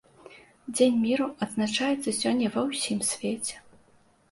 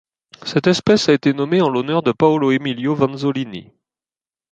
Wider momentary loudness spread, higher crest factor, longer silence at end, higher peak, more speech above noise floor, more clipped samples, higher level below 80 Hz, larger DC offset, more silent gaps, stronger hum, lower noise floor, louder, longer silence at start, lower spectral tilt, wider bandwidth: about the same, 11 LU vs 10 LU; about the same, 18 dB vs 18 dB; second, 0.7 s vs 0.9 s; second, -10 dBFS vs 0 dBFS; second, 35 dB vs over 73 dB; neither; second, -66 dBFS vs -56 dBFS; neither; neither; neither; second, -61 dBFS vs under -90 dBFS; second, -27 LUFS vs -17 LUFS; second, 0.25 s vs 0.45 s; second, -3.5 dB/octave vs -6 dB/octave; first, 11.5 kHz vs 9 kHz